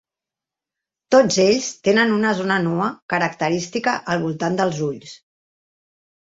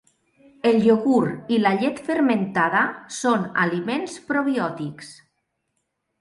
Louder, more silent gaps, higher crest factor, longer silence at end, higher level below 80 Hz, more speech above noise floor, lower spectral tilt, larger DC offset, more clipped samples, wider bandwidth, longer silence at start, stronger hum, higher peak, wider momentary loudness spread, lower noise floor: about the same, -19 LUFS vs -21 LUFS; first, 3.02-3.09 s vs none; about the same, 20 dB vs 16 dB; about the same, 1.05 s vs 1.05 s; about the same, -62 dBFS vs -66 dBFS; first, 69 dB vs 54 dB; about the same, -4.5 dB/octave vs -5.5 dB/octave; neither; neither; second, 8 kHz vs 11.5 kHz; first, 1.1 s vs 0.65 s; neither; first, -2 dBFS vs -6 dBFS; second, 7 LU vs 10 LU; first, -88 dBFS vs -75 dBFS